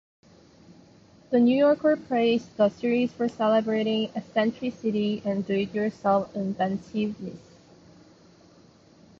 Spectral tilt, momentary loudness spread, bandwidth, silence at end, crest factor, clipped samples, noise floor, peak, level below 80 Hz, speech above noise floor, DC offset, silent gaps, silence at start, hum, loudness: -7 dB/octave; 9 LU; 7.4 kHz; 1.8 s; 16 dB; under 0.1%; -55 dBFS; -10 dBFS; -64 dBFS; 30 dB; under 0.1%; none; 1.3 s; none; -25 LUFS